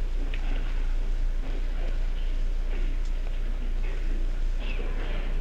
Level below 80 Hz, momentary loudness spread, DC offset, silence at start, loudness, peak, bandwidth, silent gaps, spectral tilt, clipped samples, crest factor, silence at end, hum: -26 dBFS; 1 LU; under 0.1%; 0 s; -34 LUFS; -18 dBFS; 6.2 kHz; none; -6 dB/octave; under 0.1%; 8 dB; 0 s; none